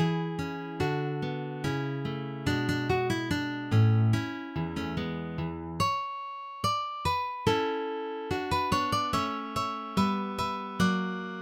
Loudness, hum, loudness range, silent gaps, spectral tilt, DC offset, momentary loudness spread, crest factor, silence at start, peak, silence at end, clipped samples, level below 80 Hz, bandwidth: -30 LUFS; none; 2 LU; none; -6 dB/octave; under 0.1%; 7 LU; 18 dB; 0 s; -12 dBFS; 0 s; under 0.1%; -54 dBFS; 16.5 kHz